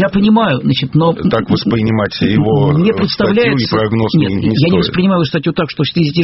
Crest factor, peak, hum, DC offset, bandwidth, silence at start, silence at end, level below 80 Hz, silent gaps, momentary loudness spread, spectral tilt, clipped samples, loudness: 12 dB; 0 dBFS; none; under 0.1%; 6 kHz; 0 s; 0 s; -38 dBFS; none; 4 LU; -5.5 dB/octave; under 0.1%; -13 LUFS